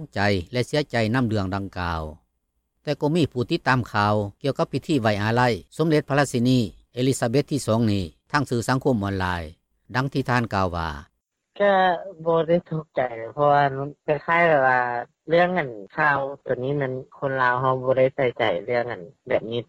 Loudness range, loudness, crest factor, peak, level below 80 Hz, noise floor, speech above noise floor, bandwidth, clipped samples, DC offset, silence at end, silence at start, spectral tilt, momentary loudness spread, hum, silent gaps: 4 LU; -23 LUFS; 16 dB; -6 dBFS; -52 dBFS; -74 dBFS; 52 dB; 15.5 kHz; under 0.1%; under 0.1%; 0.05 s; 0 s; -6 dB/octave; 9 LU; none; none